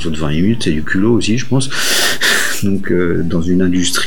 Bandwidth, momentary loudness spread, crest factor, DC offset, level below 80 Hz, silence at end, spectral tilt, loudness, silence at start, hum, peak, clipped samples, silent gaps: 19.5 kHz; 5 LU; 14 dB; 10%; -36 dBFS; 0 s; -4 dB/octave; -14 LUFS; 0 s; none; -2 dBFS; under 0.1%; none